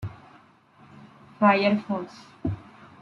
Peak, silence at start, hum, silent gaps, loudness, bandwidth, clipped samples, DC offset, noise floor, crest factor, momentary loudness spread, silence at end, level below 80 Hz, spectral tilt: -6 dBFS; 0 s; none; none; -24 LUFS; 6.8 kHz; under 0.1%; under 0.1%; -55 dBFS; 22 dB; 20 LU; 0.4 s; -56 dBFS; -7.5 dB/octave